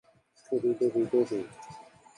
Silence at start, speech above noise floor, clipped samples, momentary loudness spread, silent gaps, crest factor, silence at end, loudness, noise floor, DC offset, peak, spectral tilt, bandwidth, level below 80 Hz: 0.5 s; 22 dB; under 0.1%; 21 LU; none; 16 dB; 0.35 s; -29 LUFS; -50 dBFS; under 0.1%; -14 dBFS; -7.5 dB/octave; 10.5 kHz; -74 dBFS